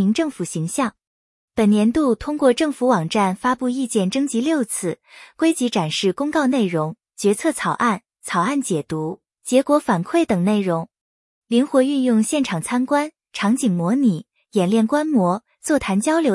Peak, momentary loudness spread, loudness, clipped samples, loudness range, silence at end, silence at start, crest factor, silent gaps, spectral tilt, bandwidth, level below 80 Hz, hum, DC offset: -4 dBFS; 8 LU; -20 LUFS; under 0.1%; 2 LU; 0 s; 0 s; 16 dB; 1.07-1.48 s, 11.01-11.42 s; -5.5 dB/octave; 12 kHz; -54 dBFS; none; under 0.1%